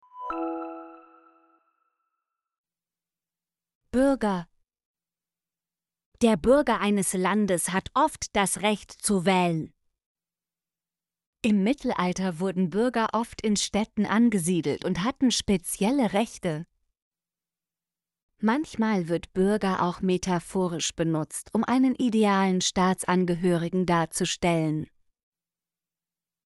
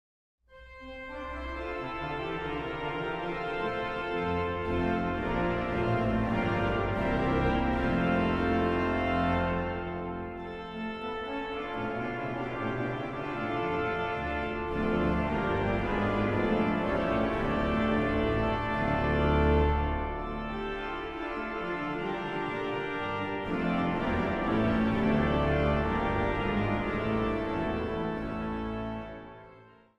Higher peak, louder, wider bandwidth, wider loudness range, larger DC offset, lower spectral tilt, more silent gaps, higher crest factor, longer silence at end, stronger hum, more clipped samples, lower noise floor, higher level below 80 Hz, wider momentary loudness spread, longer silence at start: first, -8 dBFS vs -14 dBFS; first, -25 LUFS vs -30 LUFS; first, 12 kHz vs 8.8 kHz; about the same, 7 LU vs 6 LU; neither; second, -5 dB/octave vs -8 dB/octave; first, 2.58-2.64 s, 3.75-3.81 s, 4.85-4.94 s, 6.06-6.12 s, 10.06-10.15 s, 11.27-11.33 s, 17.02-17.11 s, 18.23-18.29 s vs none; about the same, 18 dB vs 16 dB; first, 1.6 s vs 0.3 s; neither; neither; first, under -90 dBFS vs -55 dBFS; second, -54 dBFS vs -40 dBFS; about the same, 8 LU vs 9 LU; second, 0.15 s vs 0.5 s